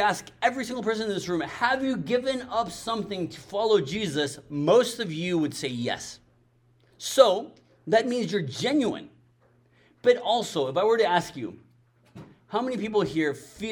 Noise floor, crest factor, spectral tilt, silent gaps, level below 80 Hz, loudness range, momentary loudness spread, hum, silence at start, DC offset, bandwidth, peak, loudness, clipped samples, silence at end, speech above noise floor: -63 dBFS; 24 dB; -4.5 dB/octave; none; -62 dBFS; 2 LU; 11 LU; none; 0 s; under 0.1%; 19 kHz; -2 dBFS; -26 LUFS; under 0.1%; 0 s; 37 dB